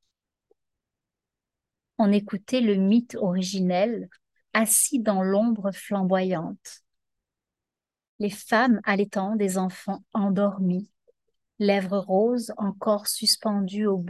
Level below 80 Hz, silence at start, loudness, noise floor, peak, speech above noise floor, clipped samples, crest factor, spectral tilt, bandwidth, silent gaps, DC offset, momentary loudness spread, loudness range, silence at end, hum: -74 dBFS; 2 s; -24 LUFS; under -90 dBFS; -6 dBFS; over 66 dB; under 0.1%; 18 dB; -4.5 dB/octave; 13 kHz; 8.09-8.19 s; under 0.1%; 10 LU; 4 LU; 0 s; none